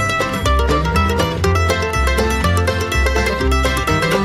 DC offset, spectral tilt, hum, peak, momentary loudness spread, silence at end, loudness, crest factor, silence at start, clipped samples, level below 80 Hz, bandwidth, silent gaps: 0.3%; -5 dB/octave; none; -4 dBFS; 1 LU; 0 s; -16 LUFS; 12 dB; 0 s; under 0.1%; -22 dBFS; 16 kHz; none